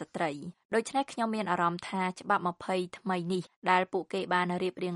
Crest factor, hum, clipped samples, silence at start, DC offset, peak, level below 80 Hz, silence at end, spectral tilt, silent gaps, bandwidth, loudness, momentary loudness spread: 20 dB; none; under 0.1%; 0 s; under 0.1%; -10 dBFS; -74 dBFS; 0 s; -5.5 dB/octave; 0.65-0.69 s, 3.56-3.62 s; 11.5 kHz; -31 LUFS; 6 LU